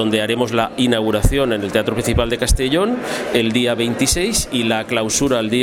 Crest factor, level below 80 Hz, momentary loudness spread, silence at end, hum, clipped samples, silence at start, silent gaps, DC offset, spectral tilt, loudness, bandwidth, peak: 16 dB; -28 dBFS; 2 LU; 0 s; none; under 0.1%; 0 s; none; under 0.1%; -4 dB/octave; -17 LUFS; 17 kHz; 0 dBFS